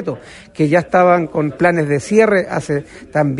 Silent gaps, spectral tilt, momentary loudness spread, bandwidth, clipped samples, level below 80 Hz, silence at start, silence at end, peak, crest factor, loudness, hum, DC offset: none; -7 dB/octave; 11 LU; 11.5 kHz; under 0.1%; -50 dBFS; 0 s; 0 s; 0 dBFS; 14 dB; -15 LUFS; none; under 0.1%